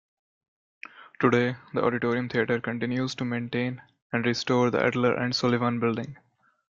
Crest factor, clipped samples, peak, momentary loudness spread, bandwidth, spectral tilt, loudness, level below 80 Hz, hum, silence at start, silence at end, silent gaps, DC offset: 18 dB; under 0.1%; -8 dBFS; 14 LU; 7.6 kHz; -6 dB/octave; -26 LUFS; -66 dBFS; none; 0.95 s; 0.6 s; 4.02-4.10 s; under 0.1%